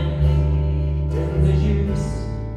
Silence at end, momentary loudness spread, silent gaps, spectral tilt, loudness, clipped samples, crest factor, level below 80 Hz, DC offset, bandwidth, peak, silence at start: 0 s; 6 LU; none; -8.5 dB/octave; -21 LUFS; under 0.1%; 12 dB; -22 dBFS; under 0.1%; 9 kHz; -8 dBFS; 0 s